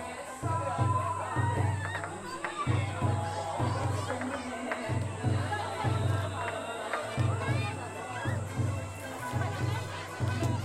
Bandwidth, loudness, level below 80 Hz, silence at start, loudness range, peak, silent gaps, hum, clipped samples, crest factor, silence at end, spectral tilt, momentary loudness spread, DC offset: 14 kHz; -33 LUFS; -56 dBFS; 0 s; 2 LU; -16 dBFS; none; none; under 0.1%; 16 dB; 0 s; -6 dB/octave; 7 LU; under 0.1%